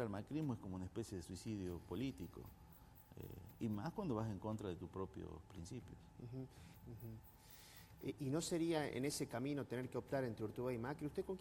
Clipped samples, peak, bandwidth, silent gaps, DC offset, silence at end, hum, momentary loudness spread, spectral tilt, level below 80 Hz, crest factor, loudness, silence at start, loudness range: under 0.1%; -28 dBFS; 17 kHz; none; under 0.1%; 0 s; none; 17 LU; -6 dB/octave; -66 dBFS; 18 dB; -46 LUFS; 0 s; 9 LU